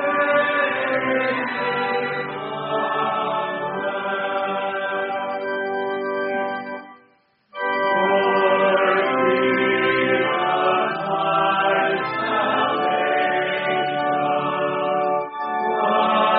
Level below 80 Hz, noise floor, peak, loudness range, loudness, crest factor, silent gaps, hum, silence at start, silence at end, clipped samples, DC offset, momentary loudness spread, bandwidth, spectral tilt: -66 dBFS; -59 dBFS; -6 dBFS; 6 LU; -21 LUFS; 16 dB; none; none; 0 s; 0 s; under 0.1%; under 0.1%; 7 LU; 5.2 kHz; -2 dB/octave